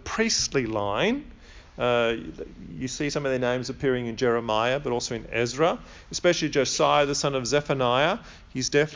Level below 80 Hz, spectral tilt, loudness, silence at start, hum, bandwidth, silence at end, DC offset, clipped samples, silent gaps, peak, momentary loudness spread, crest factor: -50 dBFS; -4 dB/octave; -25 LUFS; 0 s; none; 7.6 kHz; 0 s; under 0.1%; under 0.1%; none; -8 dBFS; 11 LU; 18 dB